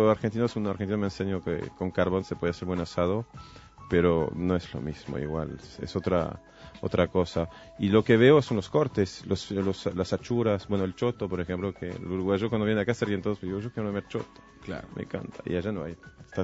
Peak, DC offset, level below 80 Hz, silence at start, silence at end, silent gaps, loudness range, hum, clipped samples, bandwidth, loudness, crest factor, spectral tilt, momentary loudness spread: -6 dBFS; under 0.1%; -52 dBFS; 0 s; 0 s; none; 6 LU; none; under 0.1%; 8 kHz; -28 LUFS; 22 dB; -7 dB/octave; 12 LU